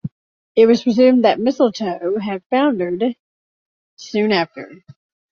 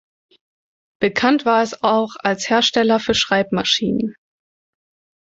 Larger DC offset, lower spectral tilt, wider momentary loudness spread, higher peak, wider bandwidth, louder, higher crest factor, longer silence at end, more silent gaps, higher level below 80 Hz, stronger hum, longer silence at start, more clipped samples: neither; first, -6 dB/octave vs -3.5 dB/octave; first, 12 LU vs 6 LU; about the same, -2 dBFS vs -2 dBFS; second, 7 kHz vs 8 kHz; about the same, -17 LUFS vs -18 LUFS; about the same, 16 dB vs 18 dB; second, 0.55 s vs 1.1 s; first, 0.11-0.55 s, 2.46-2.50 s, 3.20-3.97 s vs none; second, -62 dBFS vs -54 dBFS; neither; second, 0.05 s vs 1 s; neither